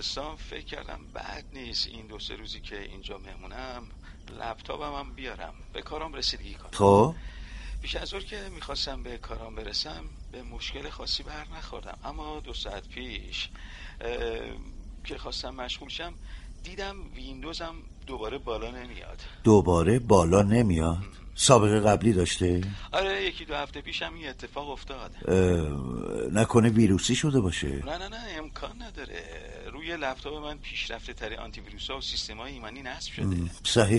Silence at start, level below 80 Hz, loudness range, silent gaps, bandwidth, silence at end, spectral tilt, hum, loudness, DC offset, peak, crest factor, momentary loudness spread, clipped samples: 0 s; -42 dBFS; 14 LU; none; 11.5 kHz; 0 s; -5 dB/octave; none; -28 LUFS; under 0.1%; -2 dBFS; 26 dB; 20 LU; under 0.1%